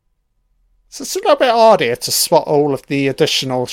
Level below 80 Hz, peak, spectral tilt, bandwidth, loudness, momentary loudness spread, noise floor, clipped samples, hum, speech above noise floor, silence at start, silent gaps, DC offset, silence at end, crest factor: -56 dBFS; 0 dBFS; -3.5 dB/octave; 17 kHz; -14 LUFS; 8 LU; -64 dBFS; under 0.1%; none; 50 dB; 0.95 s; none; under 0.1%; 0 s; 16 dB